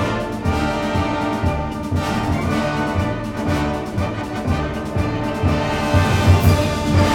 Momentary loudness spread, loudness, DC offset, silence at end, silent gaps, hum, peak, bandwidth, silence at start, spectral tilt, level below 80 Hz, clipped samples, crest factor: 8 LU; -20 LUFS; under 0.1%; 0 s; none; none; -2 dBFS; 19.5 kHz; 0 s; -6.5 dB/octave; -30 dBFS; under 0.1%; 16 dB